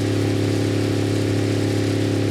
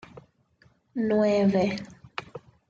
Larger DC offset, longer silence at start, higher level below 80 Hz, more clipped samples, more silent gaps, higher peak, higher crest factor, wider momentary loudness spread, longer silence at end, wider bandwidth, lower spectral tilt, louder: neither; second, 0 s vs 0.15 s; first, -46 dBFS vs -64 dBFS; neither; neither; first, -10 dBFS vs -14 dBFS; about the same, 10 dB vs 14 dB; second, 0 LU vs 17 LU; second, 0 s vs 0.3 s; first, 14.5 kHz vs 7.4 kHz; about the same, -6.5 dB/octave vs -7 dB/octave; first, -21 LUFS vs -25 LUFS